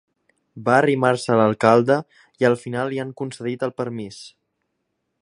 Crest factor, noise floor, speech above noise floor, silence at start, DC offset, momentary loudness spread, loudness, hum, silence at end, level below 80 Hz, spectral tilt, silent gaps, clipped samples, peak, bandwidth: 20 dB; -75 dBFS; 55 dB; 0.55 s; under 0.1%; 13 LU; -20 LUFS; none; 0.95 s; -64 dBFS; -6.5 dB/octave; none; under 0.1%; 0 dBFS; 11 kHz